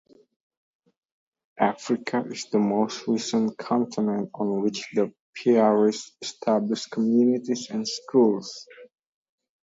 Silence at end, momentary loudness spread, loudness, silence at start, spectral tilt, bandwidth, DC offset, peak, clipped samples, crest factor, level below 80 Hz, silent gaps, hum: 0.75 s; 9 LU; -25 LUFS; 1.6 s; -5.5 dB/octave; 7.8 kHz; under 0.1%; -6 dBFS; under 0.1%; 20 dB; -74 dBFS; 5.20-5.33 s; none